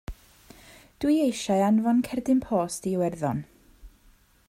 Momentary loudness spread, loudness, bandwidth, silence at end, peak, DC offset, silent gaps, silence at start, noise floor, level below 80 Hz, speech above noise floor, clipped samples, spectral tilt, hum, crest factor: 8 LU; -25 LUFS; 16 kHz; 0.6 s; -12 dBFS; under 0.1%; none; 0.1 s; -59 dBFS; -52 dBFS; 35 dB; under 0.1%; -6 dB/octave; none; 14 dB